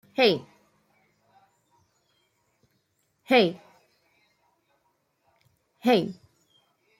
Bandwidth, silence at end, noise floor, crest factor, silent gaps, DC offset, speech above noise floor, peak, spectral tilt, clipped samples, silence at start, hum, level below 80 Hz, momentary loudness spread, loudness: 16 kHz; 0.85 s; -73 dBFS; 22 dB; none; under 0.1%; 51 dB; -8 dBFS; -5.5 dB/octave; under 0.1%; 0.2 s; none; -74 dBFS; 19 LU; -24 LUFS